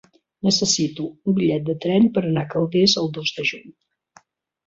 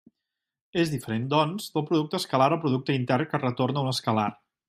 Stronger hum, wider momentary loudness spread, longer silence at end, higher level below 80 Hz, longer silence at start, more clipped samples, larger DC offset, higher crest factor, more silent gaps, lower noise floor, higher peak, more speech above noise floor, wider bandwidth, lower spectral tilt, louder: neither; first, 8 LU vs 5 LU; first, 0.95 s vs 0.35 s; first, -60 dBFS vs -66 dBFS; second, 0.45 s vs 0.75 s; neither; neither; about the same, 18 dB vs 20 dB; neither; second, -55 dBFS vs -86 dBFS; first, -4 dBFS vs -8 dBFS; second, 35 dB vs 61 dB; second, 7.8 kHz vs 15.5 kHz; second, -4.5 dB/octave vs -6 dB/octave; first, -20 LUFS vs -26 LUFS